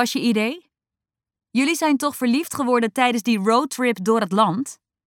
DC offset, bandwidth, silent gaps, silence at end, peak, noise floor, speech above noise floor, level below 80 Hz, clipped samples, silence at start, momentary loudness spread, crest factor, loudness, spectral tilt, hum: under 0.1%; 17.5 kHz; none; 0.35 s; -4 dBFS; -89 dBFS; 69 dB; -72 dBFS; under 0.1%; 0 s; 8 LU; 18 dB; -20 LUFS; -4.5 dB/octave; none